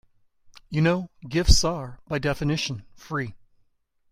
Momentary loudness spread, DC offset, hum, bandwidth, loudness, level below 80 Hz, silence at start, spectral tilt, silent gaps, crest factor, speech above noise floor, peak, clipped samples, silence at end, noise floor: 12 LU; under 0.1%; none; 15.5 kHz; -25 LUFS; -32 dBFS; 0.7 s; -4.5 dB/octave; none; 24 dB; 43 dB; -2 dBFS; under 0.1%; 0.75 s; -67 dBFS